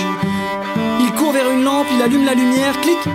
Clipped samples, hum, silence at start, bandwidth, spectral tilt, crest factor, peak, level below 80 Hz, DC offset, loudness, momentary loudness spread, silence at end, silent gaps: under 0.1%; none; 0 s; 16 kHz; -4.5 dB/octave; 12 dB; -4 dBFS; -54 dBFS; under 0.1%; -16 LUFS; 6 LU; 0 s; none